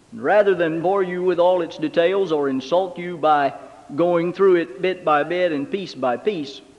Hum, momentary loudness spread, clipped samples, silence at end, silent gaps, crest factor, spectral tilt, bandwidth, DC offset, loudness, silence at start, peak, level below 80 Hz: none; 8 LU; under 0.1%; 0.2 s; none; 16 dB; -6.5 dB/octave; 9.6 kHz; under 0.1%; -20 LUFS; 0.1 s; -4 dBFS; -66 dBFS